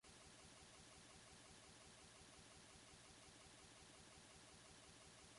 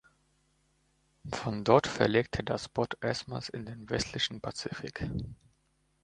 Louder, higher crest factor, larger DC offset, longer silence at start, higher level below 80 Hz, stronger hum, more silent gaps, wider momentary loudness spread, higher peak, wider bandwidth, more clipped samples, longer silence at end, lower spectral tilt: second, -63 LUFS vs -32 LUFS; second, 14 dB vs 26 dB; neither; second, 0.05 s vs 1.25 s; second, -78 dBFS vs -54 dBFS; neither; neither; second, 0 LU vs 15 LU; second, -50 dBFS vs -6 dBFS; about the same, 11.5 kHz vs 11 kHz; neither; second, 0 s vs 0.7 s; second, -2.5 dB/octave vs -5 dB/octave